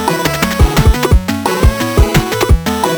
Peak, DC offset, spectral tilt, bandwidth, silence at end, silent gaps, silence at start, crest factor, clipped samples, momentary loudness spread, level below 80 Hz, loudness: 0 dBFS; under 0.1%; -5 dB/octave; over 20 kHz; 0 s; none; 0 s; 12 dB; under 0.1%; 3 LU; -14 dBFS; -12 LUFS